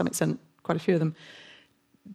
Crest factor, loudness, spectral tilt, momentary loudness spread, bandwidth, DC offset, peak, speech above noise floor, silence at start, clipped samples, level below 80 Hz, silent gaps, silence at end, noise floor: 20 dB; -28 LUFS; -6 dB/octave; 21 LU; 15.5 kHz; under 0.1%; -10 dBFS; 34 dB; 0 s; under 0.1%; -68 dBFS; none; 0 s; -61 dBFS